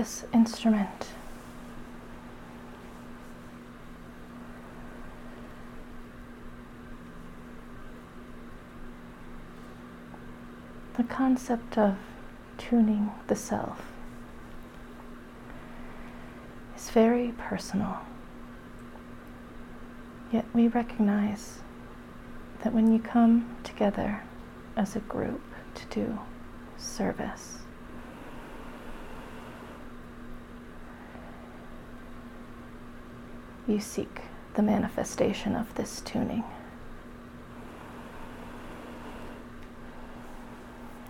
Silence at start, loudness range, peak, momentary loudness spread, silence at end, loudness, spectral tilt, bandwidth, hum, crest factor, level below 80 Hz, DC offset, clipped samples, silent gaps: 0 s; 18 LU; -12 dBFS; 21 LU; 0 s; -29 LUFS; -6 dB/octave; 15.5 kHz; none; 22 dB; -48 dBFS; under 0.1%; under 0.1%; none